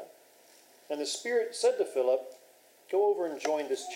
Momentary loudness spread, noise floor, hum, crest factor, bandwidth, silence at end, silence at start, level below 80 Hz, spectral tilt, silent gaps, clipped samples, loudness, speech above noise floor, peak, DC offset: 9 LU; -60 dBFS; none; 16 dB; 16 kHz; 0 s; 0 s; under -90 dBFS; -1.5 dB/octave; none; under 0.1%; -30 LUFS; 30 dB; -16 dBFS; under 0.1%